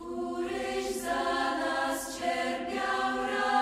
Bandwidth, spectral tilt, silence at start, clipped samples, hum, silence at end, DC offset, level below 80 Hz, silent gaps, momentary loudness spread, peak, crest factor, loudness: 16 kHz; -2.5 dB/octave; 0 s; under 0.1%; none; 0 s; under 0.1%; -58 dBFS; none; 4 LU; -14 dBFS; 18 dB; -31 LUFS